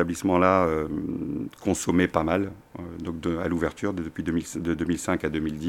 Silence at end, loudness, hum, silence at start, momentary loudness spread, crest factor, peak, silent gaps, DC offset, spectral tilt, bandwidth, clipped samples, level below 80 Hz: 0 s; -26 LUFS; none; 0 s; 11 LU; 22 dB; -4 dBFS; none; under 0.1%; -6 dB/octave; 16.5 kHz; under 0.1%; -48 dBFS